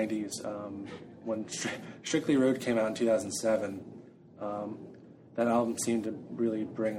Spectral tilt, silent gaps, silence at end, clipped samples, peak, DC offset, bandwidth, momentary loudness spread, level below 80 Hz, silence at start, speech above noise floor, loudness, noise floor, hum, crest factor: -4.5 dB/octave; none; 0 s; under 0.1%; -14 dBFS; under 0.1%; 16 kHz; 15 LU; -72 dBFS; 0 s; 21 dB; -32 LUFS; -52 dBFS; none; 18 dB